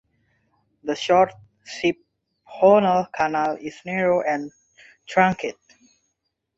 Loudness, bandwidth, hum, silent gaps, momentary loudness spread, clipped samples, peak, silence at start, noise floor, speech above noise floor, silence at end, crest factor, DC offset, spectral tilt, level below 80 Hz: -21 LUFS; 8 kHz; none; none; 16 LU; under 0.1%; -2 dBFS; 0.85 s; -77 dBFS; 56 dB; 1.05 s; 22 dB; under 0.1%; -5.5 dB/octave; -62 dBFS